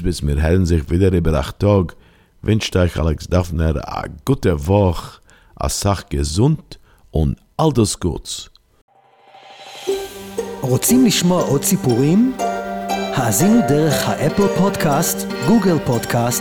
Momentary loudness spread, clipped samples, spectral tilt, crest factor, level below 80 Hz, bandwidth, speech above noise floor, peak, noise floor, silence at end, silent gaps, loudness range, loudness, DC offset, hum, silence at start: 11 LU; under 0.1%; -5.5 dB/octave; 16 dB; -32 dBFS; 19 kHz; 32 dB; -2 dBFS; -48 dBFS; 0 s; 8.81-8.88 s; 6 LU; -18 LUFS; under 0.1%; none; 0 s